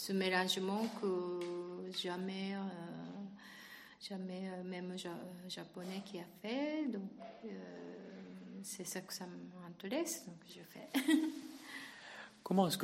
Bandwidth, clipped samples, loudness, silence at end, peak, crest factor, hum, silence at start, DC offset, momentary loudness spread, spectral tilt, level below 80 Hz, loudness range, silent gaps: 16 kHz; under 0.1%; -41 LUFS; 0 s; -18 dBFS; 24 dB; none; 0 s; under 0.1%; 17 LU; -4.5 dB/octave; -84 dBFS; 7 LU; none